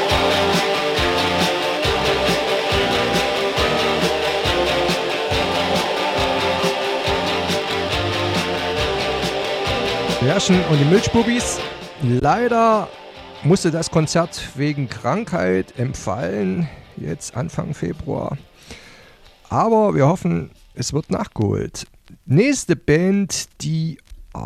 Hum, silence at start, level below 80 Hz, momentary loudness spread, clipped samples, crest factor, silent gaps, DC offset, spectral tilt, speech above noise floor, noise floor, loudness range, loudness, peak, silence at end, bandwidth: none; 0 s; -40 dBFS; 10 LU; under 0.1%; 16 dB; none; under 0.1%; -4.5 dB/octave; 28 dB; -47 dBFS; 5 LU; -19 LUFS; -4 dBFS; 0 s; 16.5 kHz